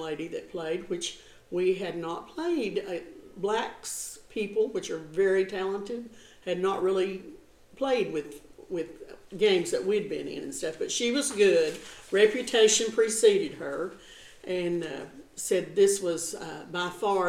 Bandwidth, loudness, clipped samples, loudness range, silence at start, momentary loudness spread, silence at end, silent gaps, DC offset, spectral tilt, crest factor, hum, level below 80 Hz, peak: 15.5 kHz; -28 LUFS; under 0.1%; 7 LU; 0 s; 16 LU; 0 s; none; under 0.1%; -3 dB/octave; 20 dB; none; -62 dBFS; -8 dBFS